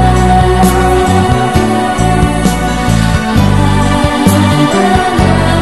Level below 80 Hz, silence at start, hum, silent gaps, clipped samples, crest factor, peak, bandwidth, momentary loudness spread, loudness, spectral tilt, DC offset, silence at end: -18 dBFS; 0 s; none; none; 0.9%; 8 dB; 0 dBFS; 12.5 kHz; 3 LU; -10 LUFS; -6 dB/octave; 2%; 0 s